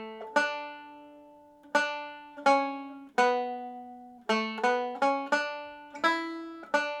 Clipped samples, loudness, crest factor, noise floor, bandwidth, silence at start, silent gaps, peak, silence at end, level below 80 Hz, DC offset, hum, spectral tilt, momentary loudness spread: under 0.1%; -29 LUFS; 20 dB; -54 dBFS; 13.5 kHz; 0 s; none; -10 dBFS; 0 s; -80 dBFS; under 0.1%; none; -3 dB/octave; 16 LU